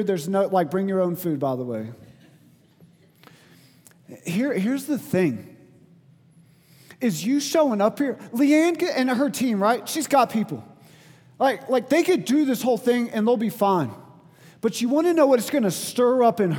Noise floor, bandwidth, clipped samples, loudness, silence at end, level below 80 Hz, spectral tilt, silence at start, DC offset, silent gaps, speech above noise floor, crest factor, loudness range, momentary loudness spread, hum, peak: -55 dBFS; 19.5 kHz; under 0.1%; -22 LUFS; 0 s; -74 dBFS; -5.5 dB/octave; 0 s; under 0.1%; none; 33 dB; 18 dB; 8 LU; 9 LU; none; -6 dBFS